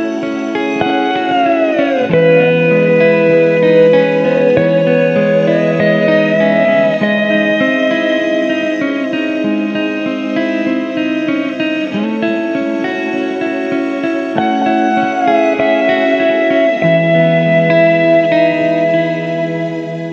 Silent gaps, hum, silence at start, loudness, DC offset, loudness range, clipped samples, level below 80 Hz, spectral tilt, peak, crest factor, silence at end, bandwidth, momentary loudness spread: none; none; 0 s; -12 LUFS; under 0.1%; 6 LU; under 0.1%; -58 dBFS; -7 dB/octave; 0 dBFS; 12 dB; 0 s; 7.2 kHz; 7 LU